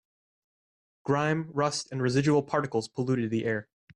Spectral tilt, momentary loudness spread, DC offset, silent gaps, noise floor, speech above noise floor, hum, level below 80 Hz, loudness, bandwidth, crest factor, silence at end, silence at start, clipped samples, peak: -6 dB/octave; 7 LU; under 0.1%; none; under -90 dBFS; over 63 dB; none; -66 dBFS; -28 LUFS; 11.5 kHz; 16 dB; 0.35 s; 1.05 s; under 0.1%; -14 dBFS